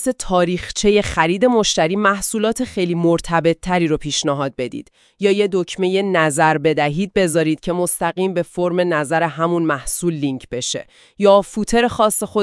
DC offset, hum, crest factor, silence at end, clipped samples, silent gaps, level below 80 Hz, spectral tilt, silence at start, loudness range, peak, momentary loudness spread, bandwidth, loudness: under 0.1%; none; 16 dB; 0 s; under 0.1%; none; -42 dBFS; -4.5 dB/octave; 0 s; 3 LU; 0 dBFS; 6 LU; 12 kHz; -18 LUFS